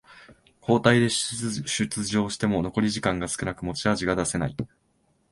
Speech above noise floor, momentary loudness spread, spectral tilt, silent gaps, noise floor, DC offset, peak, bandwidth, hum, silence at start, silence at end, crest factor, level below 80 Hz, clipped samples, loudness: 43 dB; 10 LU; -4.5 dB/octave; none; -68 dBFS; under 0.1%; -4 dBFS; 11.5 kHz; none; 0.1 s; 0.65 s; 22 dB; -50 dBFS; under 0.1%; -25 LUFS